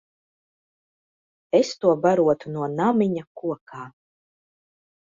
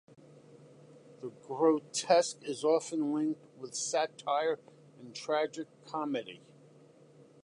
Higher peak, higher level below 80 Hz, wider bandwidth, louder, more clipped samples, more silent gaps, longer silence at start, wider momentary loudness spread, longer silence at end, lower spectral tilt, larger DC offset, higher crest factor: first, -6 dBFS vs -12 dBFS; first, -66 dBFS vs -88 dBFS; second, 7.8 kHz vs 11.5 kHz; first, -22 LUFS vs -32 LUFS; neither; first, 3.27-3.35 s, 3.61-3.66 s vs none; first, 1.55 s vs 0.55 s; about the same, 17 LU vs 19 LU; about the same, 1.15 s vs 1.1 s; first, -6.5 dB/octave vs -3.5 dB/octave; neither; about the same, 20 dB vs 22 dB